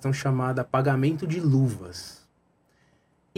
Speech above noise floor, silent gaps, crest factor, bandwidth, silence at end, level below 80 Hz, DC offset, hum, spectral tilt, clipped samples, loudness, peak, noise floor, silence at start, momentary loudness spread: 42 dB; none; 18 dB; 13.5 kHz; 1.25 s; -62 dBFS; under 0.1%; none; -7 dB/octave; under 0.1%; -25 LUFS; -10 dBFS; -66 dBFS; 0 s; 16 LU